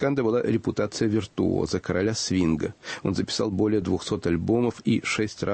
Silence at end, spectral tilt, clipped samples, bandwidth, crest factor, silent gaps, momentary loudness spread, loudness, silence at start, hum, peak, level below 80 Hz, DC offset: 0 s; -5.5 dB/octave; under 0.1%; 8.8 kHz; 14 dB; none; 4 LU; -25 LUFS; 0 s; none; -12 dBFS; -50 dBFS; under 0.1%